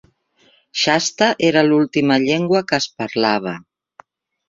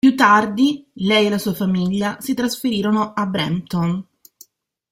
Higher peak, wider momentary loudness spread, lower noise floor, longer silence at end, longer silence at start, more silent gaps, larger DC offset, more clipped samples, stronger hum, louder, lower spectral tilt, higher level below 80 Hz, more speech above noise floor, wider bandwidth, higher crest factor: about the same, -2 dBFS vs -2 dBFS; about the same, 8 LU vs 9 LU; first, -57 dBFS vs -51 dBFS; about the same, 0.9 s vs 0.9 s; first, 0.75 s vs 0.05 s; neither; neither; neither; neither; about the same, -17 LUFS vs -19 LUFS; second, -4 dB/octave vs -5.5 dB/octave; about the same, -60 dBFS vs -56 dBFS; first, 40 dB vs 33 dB; second, 7.8 kHz vs 16.5 kHz; about the same, 16 dB vs 16 dB